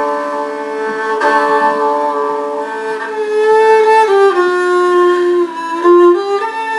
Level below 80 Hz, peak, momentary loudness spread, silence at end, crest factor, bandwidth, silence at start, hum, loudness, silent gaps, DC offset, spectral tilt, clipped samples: -74 dBFS; 0 dBFS; 11 LU; 0 s; 12 dB; 11.5 kHz; 0 s; none; -12 LUFS; none; under 0.1%; -3.5 dB/octave; under 0.1%